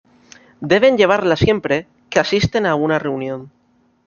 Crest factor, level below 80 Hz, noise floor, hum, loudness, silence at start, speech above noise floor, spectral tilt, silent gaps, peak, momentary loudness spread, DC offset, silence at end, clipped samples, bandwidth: 16 dB; -46 dBFS; -59 dBFS; none; -16 LUFS; 0.6 s; 43 dB; -5.5 dB/octave; none; 0 dBFS; 12 LU; under 0.1%; 0.6 s; under 0.1%; 7.2 kHz